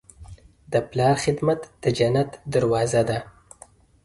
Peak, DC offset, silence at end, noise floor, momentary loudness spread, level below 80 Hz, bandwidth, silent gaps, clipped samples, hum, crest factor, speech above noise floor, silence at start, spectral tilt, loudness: -6 dBFS; under 0.1%; 0.75 s; -52 dBFS; 6 LU; -50 dBFS; 11.5 kHz; none; under 0.1%; none; 18 dB; 30 dB; 0.2 s; -6 dB/octave; -23 LUFS